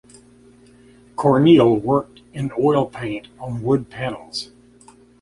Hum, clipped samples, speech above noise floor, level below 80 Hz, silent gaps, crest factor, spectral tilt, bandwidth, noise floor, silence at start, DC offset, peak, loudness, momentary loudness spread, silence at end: 60 Hz at -40 dBFS; under 0.1%; 31 dB; -54 dBFS; none; 18 dB; -7.5 dB/octave; 11.5 kHz; -49 dBFS; 1.2 s; under 0.1%; -2 dBFS; -19 LUFS; 18 LU; 0.75 s